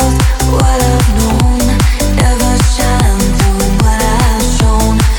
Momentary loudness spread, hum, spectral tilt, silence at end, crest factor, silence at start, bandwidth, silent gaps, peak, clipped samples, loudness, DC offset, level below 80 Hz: 1 LU; none; -5 dB/octave; 0 s; 10 dB; 0 s; 19.5 kHz; none; 0 dBFS; under 0.1%; -11 LUFS; under 0.1%; -12 dBFS